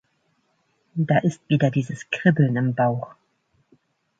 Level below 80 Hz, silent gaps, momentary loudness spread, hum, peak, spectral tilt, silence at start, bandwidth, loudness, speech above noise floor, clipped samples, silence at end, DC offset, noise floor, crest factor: -64 dBFS; none; 11 LU; none; -4 dBFS; -7.5 dB/octave; 0.95 s; 7.8 kHz; -22 LUFS; 47 dB; under 0.1%; 1.1 s; under 0.1%; -68 dBFS; 20 dB